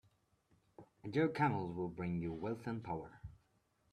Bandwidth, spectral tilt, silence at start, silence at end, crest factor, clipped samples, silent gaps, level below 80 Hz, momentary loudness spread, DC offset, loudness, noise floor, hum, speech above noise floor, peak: 11.5 kHz; -8.5 dB/octave; 0.8 s; 0.6 s; 20 dB; under 0.1%; none; -68 dBFS; 19 LU; under 0.1%; -40 LUFS; -77 dBFS; none; 39 dB; -22 dBFS